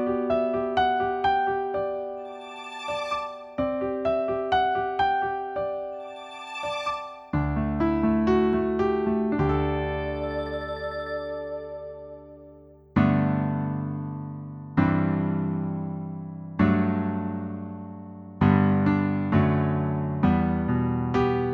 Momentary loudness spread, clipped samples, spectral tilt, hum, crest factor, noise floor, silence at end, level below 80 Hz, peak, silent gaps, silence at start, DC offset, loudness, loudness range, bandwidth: 14 LU; under 0.1%; -8.5 dB/octave; none; 18 dB; -50 dBFS; 0 s; -44 dBFS; -8 dBFS; none; 0 s; under 0.1%; -26 LUFS; 4 LU; 10 kHz